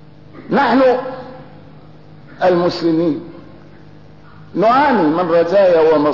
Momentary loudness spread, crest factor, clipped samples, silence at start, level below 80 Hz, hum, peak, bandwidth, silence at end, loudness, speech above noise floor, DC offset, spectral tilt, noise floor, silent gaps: 15 LU; 12 dB; under 0.1%; 0.35 s; -52 dBFS; none; -4 dBFS; 6 kHz; 0 s; -14 LUFS; 28 dB; 0.7%; -7.5 dB/octave; -41 dBFS; none